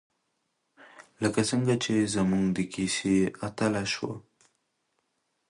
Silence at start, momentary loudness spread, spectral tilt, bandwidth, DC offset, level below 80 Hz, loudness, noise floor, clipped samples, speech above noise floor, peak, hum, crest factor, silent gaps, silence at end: 0.8 s; 6 LU; -5 dB/octave; 11.5 kHz; under 0.1%; -58 dBFS; -28 LUFS; -77 dBFS; under 0.1%; 50 dB; -12 dBFS; none; 18 dB; none; 1.3 s